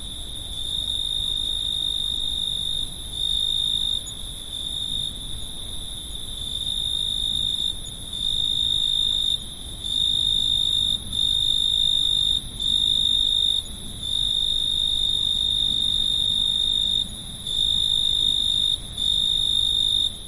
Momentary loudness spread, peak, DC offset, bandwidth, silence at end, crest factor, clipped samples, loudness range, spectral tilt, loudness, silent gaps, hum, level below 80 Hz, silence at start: 12 LU; -10 dBFS; under 0.1%; 11.5 kHz; 0 s; 14 dB; under 0.1%; 6 LU; -1.5 dB/octave; -21 LUFS; none; none; -38 dBFS; 0 s